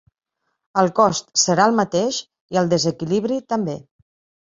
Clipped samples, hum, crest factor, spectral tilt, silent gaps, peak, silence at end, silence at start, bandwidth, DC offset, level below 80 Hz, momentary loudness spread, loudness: under 0.1%; none; 18 dB; -4 dB/octave; 2.41-2.48 s; -2 dBFS; 0.7 s; 0.75 s; 7.8 kHz; under 0.1%; -60 dBFS; 9 LU; -19 LUFS